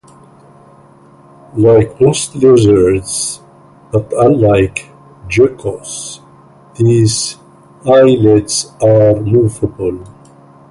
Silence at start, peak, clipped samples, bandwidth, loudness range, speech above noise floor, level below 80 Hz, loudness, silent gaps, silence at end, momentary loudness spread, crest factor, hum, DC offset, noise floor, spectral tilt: 1.55 s; 0 dBFS; under 0.1%; 11.5 kHz; 4 LU; 32 dB; -38 dBFS; -11 LUFS; none; 0.65 s; 15 LU; 12 dB; none; under 0.1%; -42 dBFS; -6 dB/octave